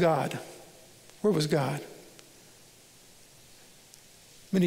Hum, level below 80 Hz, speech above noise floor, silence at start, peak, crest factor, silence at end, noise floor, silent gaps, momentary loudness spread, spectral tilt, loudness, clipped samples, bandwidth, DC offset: none; -66 dBFS; 28 dB; 0 s; -14 dBFS; 18 dB; 0 s; -55 dBFS; none; 26 LU; -6 dB/octave; -29 LUFS; under 0.1%; 16 kHz; under 0.1%